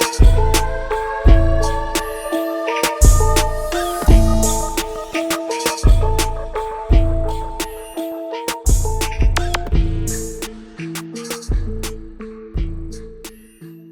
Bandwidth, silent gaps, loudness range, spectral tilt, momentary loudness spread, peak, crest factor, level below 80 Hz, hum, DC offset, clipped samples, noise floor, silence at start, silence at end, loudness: 19.5 kHz; none; 9 LU; -4.5 dB/octave; 15 LU; 0 dBFS; 16 dB; -18 dBFS; none; under 0.1%; under 0.1%; -39 dBFS; 0 s; 0 s; -19 LUFS